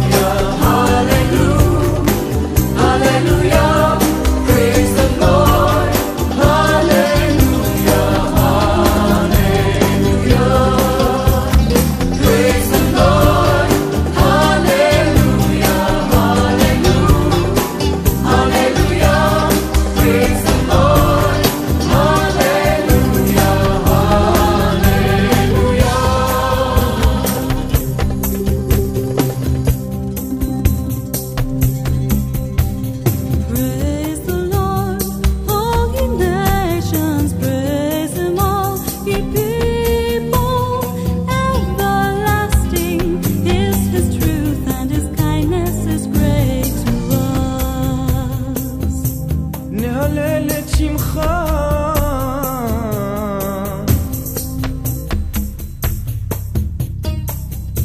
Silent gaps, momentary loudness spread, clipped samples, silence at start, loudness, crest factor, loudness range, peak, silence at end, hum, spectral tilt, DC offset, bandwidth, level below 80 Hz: none; 8 LU; under 0.1%; 0 s; -15 LUFS; 14 dB; 6 LU; 0 dBFS; 0 s; none; -5.5 dB/octave; 0.1%; 16 kHz; -22 dBFS